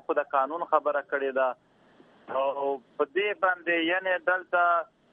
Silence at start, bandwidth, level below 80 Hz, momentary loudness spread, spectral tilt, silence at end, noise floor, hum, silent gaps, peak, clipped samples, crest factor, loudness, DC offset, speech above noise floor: 0.1 s; 3.8 kHz; -82 dBFS; 6 LU; -6 dB/octave; 0.3 s; -58 dBFS; none; none; -8 dBFS; under 0.1%; 20 dB; -27 LUFS; under 0.1%; 31 dB